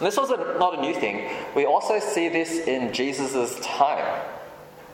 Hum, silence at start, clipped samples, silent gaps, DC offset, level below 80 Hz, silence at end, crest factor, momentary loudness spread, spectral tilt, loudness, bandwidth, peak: none; 0 s; under 0.1%; none; under 0.1%; -66 dBFS; 0 s; 20 dB; 9 LU; -3.5 dB/octave; -24 LUFS; 17.5 kHz; -6 dBFS